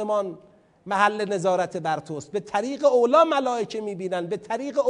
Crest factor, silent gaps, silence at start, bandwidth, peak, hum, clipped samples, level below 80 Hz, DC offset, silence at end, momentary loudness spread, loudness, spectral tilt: 18 dB; none; 0 s; 10.5 kHz; -4 dBFS; none; under 0.1%; -70 dBFS; under 0.1%; 0 s; 12 LU; -24 LUFS; -5 dB/octave